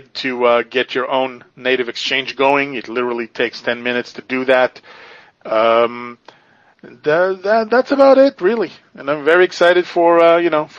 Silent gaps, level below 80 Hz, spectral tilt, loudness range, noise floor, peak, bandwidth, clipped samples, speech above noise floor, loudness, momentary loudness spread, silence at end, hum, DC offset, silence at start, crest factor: none; -66 dBFS; -4.5 dB/octave; 5 LU; -49 dBFS; 0 dBFS; 7.4 kHz; under 0.1%; 34 dB; -15 LUFS; 12 LU; 0 s; none; under 0.1%; 0.15 s; 16 dB